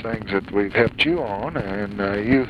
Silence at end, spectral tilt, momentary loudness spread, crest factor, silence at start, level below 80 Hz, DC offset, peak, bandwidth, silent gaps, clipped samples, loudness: 0 s; -7 dB/octave; 8 LU; 18 dB; 0 s; -44 dBFS; under 0.1%; -4 dBFS; 10.5 kHz; none; under 0.1%; -22 LUFS